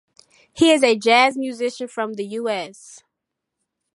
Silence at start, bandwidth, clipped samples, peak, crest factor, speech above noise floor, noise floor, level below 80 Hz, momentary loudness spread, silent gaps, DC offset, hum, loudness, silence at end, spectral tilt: 0.55 s; 11.5 kHz; under 0.1%; 0 dBFS; 20 dB; 62 dB; -82 dBFS; -66 dBFS; 12 LU; none; under 0.1%; none; -19 LUFS; 0.95 s; -3 dB/octave